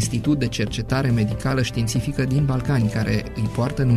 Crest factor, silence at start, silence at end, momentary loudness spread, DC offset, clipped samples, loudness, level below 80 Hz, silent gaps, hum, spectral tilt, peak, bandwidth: 14 dB; 0 s; 0 s; 3 LU; under 0.1%; under 0.1%; -22 LUFS; -36 dBFS; none; none; -6 dB/octave; -6 dBFS; 14 kHz